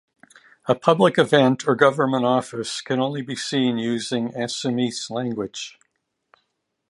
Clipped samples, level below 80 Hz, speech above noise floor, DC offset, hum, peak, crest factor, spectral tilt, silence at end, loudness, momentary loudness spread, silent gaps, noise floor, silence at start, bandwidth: under 0.1%; -68 dBFS; 53 dB; under 0.1%; none; -2 dBFS; 20 dB; -5 dB/octave; 1.2 s; -21 LUFS; 11 LU; none; -74 dBFS; 0.65 s; 11.5 kHz